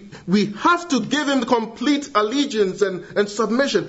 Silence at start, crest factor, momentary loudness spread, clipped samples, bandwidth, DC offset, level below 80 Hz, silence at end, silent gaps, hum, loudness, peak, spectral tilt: 0 s; 18 dB; 4 LU; under 0.1%; 8 kHz; under 0.1%; -60 dBFS; 0 s; none; none; -20 LUFS; -2 dBFS; -4.5 dB/octave